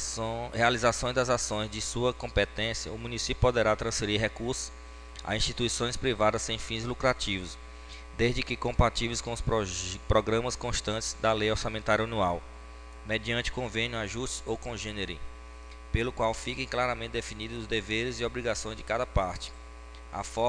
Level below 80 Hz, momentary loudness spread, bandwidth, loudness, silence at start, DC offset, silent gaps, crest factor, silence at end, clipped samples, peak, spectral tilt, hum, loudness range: -42 dBFS; 15 LU; 10 kHz; -30 LUFS; 0 s; under 0.1%; none; 22 dB; 0 s; under 0.1%; -8 dBFS; -4 dB/octave; none; 4 LU